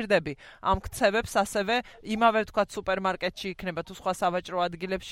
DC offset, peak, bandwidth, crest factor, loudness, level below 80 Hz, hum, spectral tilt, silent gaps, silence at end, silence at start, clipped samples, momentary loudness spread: under 0.1%; -10 dBFS; 16 kHz; 18 dB; -28 LUFS; -48 dBFS; none; -4.5 dB/octave; none; 0 s; 0 s; under 0.1%; 10 LU